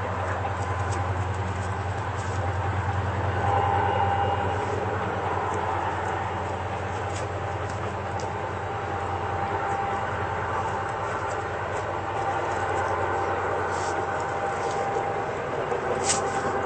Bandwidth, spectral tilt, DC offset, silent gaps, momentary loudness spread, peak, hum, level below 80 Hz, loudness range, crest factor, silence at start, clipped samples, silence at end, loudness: 8.8 kHz; -5 dB/octave; under 0.1%; none; 6 LU; -10 dBFS; none; -52 dBFS; 3 LU; 16 dB; 0 s; under 0.1%; 0 s; -28 LUFS